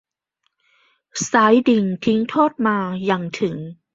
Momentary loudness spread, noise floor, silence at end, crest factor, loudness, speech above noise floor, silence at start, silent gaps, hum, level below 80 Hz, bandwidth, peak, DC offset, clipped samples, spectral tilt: 11 LU; -72 dBFS; 0.2 s; 18 dB; -18 LUFS; 54 dB; 1.15 s; none; none; -62 dBFS; 7.8 kHz; -2 dBFS; under 0.1%; under 0.1%; -5 dB/octave